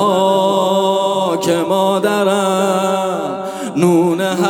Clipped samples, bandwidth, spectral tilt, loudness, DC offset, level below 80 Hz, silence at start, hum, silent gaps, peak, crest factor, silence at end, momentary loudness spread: under 0.1%; 19.5 kHz; -5 dB/octave; -15 LUFS; under 0.1%; -64 dBFS; 0 s; none; none; -2 dBFS; 12 dB; 0 s; 6 LU